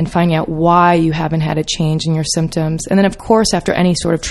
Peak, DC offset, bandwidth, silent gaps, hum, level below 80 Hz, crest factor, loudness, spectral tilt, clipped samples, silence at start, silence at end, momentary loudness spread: 0 dBFS; under 0.1%; 12 kHz; none; none; -36 dBFS; 14 dB; -14 LUFS; -5.5 dB/octave; under 0.1%; 0 s; 0 s; 6 LU